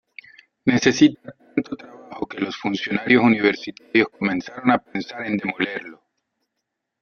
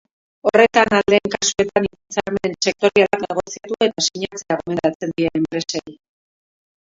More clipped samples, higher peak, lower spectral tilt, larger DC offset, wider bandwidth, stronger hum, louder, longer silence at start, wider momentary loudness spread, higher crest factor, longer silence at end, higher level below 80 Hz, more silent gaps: neither; about the same, -2 dBFS vs 0 dBFS; first, -5 dB/octave vs -3.5 dB/octave; neither; about the same, 7.2 kHz vs 7.8 kHz; neither; about the same, -21 LUFS vs -19 LUFS; first, 0.65 s vs 0.45 s; first, 17 LU vs 11 LU; about the same, 20 dB vs 20 dB; about the same, 1.05 s vs 0.95 s; second, -62 dBFS vs -52 dBFS; second, none vs 4.95-5.00 s